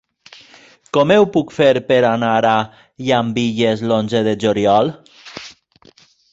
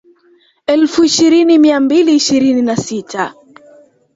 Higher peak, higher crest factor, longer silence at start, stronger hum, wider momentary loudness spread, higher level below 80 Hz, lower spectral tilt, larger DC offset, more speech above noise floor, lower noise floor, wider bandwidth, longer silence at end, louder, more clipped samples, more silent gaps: about the same, -2 dBFS vs 0 dBFS; about the same, 16 dB vs 12 dB; first, 0.95 s vs 0.7 s; neither; first, 17 LU vs 12 LU; about the same, -54 dBFS vs -54 dBFS; first, -6 dB/octave vs -4 dB/octave; neither; second, 35 dB vs 41 dB; about the same, -50 dBFS vs -51 dBFS; about the same, 8 kHz vs 8 kHz; about the same, 0.8 s vs 0.85 s; second, -16 LUFS vs -11 LUFS; neither; neither